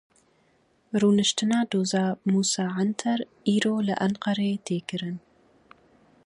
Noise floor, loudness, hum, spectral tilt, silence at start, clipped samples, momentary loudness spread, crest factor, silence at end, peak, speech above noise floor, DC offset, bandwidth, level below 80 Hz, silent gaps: -65 dBFS; -25 LUFS; none; -4.5 dB/octave; 0.95 s; under 0.1%; 9 LU; 18 dB; 1.05 s; -8 dBFS; 40 dB; under 0.1%; 11 kHz; -68 dBFS; none